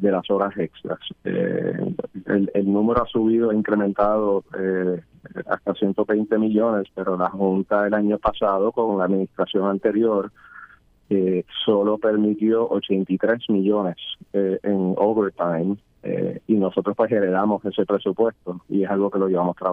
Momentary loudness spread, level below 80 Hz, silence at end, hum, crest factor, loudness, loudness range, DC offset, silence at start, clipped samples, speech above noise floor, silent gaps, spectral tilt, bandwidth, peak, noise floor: 7 LU; -52 dBFS; 0 s; none; 16 dB; -22 LUFS; 2 LU; under 0.1%; 0 s; under 0.1%; 27 dB; none; -9.5 dB/octave; 3.8 kHz; -6 dBFS; -49 dBFS